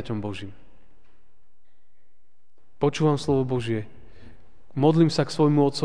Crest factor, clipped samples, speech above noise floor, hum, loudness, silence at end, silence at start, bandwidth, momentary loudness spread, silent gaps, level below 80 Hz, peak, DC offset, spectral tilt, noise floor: 20 dB; under 0.1%; 49 dB; none; -23 LUFS; 0 s; 0 s; 10 kHz; 17 LU; none; -56 dBFS; -6 dBFS; 1%; -7 dB/octave; -71 dBFS